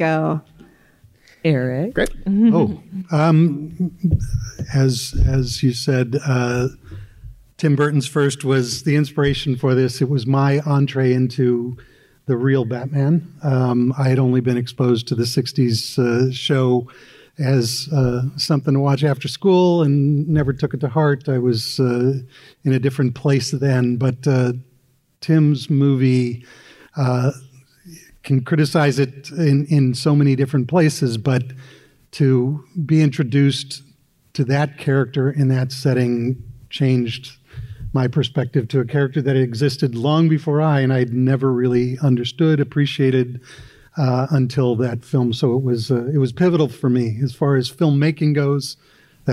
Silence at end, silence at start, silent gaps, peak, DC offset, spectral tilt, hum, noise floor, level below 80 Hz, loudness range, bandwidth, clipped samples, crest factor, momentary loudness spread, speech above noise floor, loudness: 0 s; 0 s; none; -6 dBFS; under 0.1%; -7 dB/octave; none; -59 dBFS; -40 dBFS; 3 LU; 13 kHz; under 0.1%; 12 dB; 8 LU; 41 dB; -18 LUFS